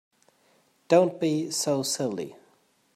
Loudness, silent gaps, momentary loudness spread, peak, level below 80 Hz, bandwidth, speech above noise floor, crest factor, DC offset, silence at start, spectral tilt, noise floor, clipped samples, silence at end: -25 LUFS; none; 12 LU; -8 dBFS; -78 dBFS; 14.5 kHz; 40 dB; 20 dB; under 0.1%; 0.9 s; -4.5 dB/octave; -65 dBFS; under 0.1%; 0.6 s